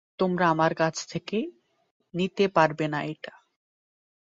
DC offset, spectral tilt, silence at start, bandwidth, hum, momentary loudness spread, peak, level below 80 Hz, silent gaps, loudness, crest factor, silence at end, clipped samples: under 0.1%; -5.5 dB/octave; 0.2 s; 7.8 kHz; none; 15 LU; -6 dBFS; -68 dBFS; 1.91-2.00 s; -26 LUFS; 22 dB; 0.95 s; under 0.1%